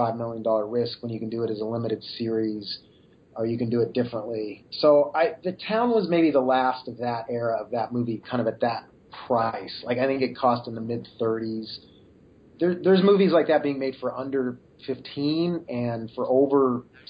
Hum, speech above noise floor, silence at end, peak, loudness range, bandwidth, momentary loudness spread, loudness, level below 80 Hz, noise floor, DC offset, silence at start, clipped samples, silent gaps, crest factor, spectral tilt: none; 29 dB; 0.25 s; -8 dBFS; 5 LU; 5.2 kHz; 13 LU; -25 LUFS; -64 dBFS; -54 dBFS; under 0.1%; 0 s; under 0.1%; none; 18 dB; -10 dB/octave